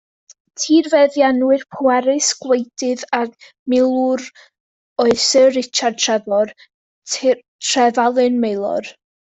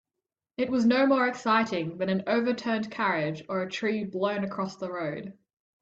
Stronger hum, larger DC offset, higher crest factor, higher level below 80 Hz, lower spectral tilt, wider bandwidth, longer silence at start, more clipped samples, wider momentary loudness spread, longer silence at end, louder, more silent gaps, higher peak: neither; neither; about the same, 14 dB vs 18 dB; first, -62 dBFS vs -70 dBFS; second, -2.5 dB/octave vs -6 dB/octave; about the same, 8.4 kHz vs 7.8 kHz; about the same, 0.6 s vs 0.6 s; neither; about the same, 11 LU vs 10 LU; about the same, 0.4 s vs 0.5 s; first, -16 LUFS vs -28 LUFS; first, 3.59-3.66 s, 4.60-4.96 s, 6.74-7.02 s, 7.48-7.59 s vs none; first, -2 dBFS vs -10 dBFS